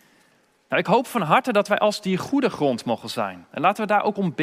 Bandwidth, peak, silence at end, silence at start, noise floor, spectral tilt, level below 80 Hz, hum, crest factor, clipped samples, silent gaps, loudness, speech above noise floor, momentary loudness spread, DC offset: 16 kHz; -2 dBFS; 0 s; 0.7 s; -61 dBFS; -5.5 dB/octave; -68 dBFS; none; 22 dB; under 0.1%; none; -22 LUFS; 39 dB; 7 LU; under 0.1%